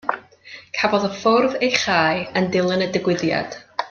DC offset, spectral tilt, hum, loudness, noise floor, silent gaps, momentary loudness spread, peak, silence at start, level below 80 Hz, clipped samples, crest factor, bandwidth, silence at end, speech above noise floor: under 0.1%; -4.5 dB/octave; none; -20 LUFS; -43 dBFS; none; 12 LU; -2 dBFS; 0.05 s; -60 dBFS; under 0.1%; 20 dB; 7.2 kHz; 0 s; 24 dB